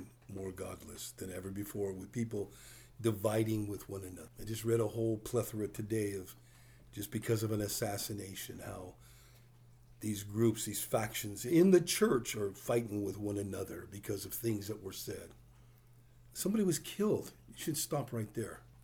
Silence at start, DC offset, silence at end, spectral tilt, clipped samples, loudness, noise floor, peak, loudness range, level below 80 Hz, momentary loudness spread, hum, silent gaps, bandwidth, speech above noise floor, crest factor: 0 s; under 0.1%; 0.05 s; -5 dB/octave; under 0.1%; -36 LUFS; -61 dBFS; -14 dBFS; 7 LU; -64 dBFS; 14 LU; none; none; over 20 kHz; 25 dB; 22 dB